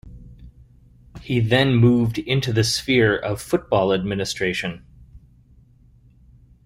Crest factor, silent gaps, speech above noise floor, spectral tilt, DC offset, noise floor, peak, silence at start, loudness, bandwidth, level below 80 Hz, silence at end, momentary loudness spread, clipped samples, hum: 18 dB; none; 33 dB; -5.5 dB/octave; under 0.1%; -52 dBFS; -4 dBFS; 0.05 s; -20 LUFS; 16 kHz; -46 dBFS; 1.5 s; 9 LU; under 0.1%; none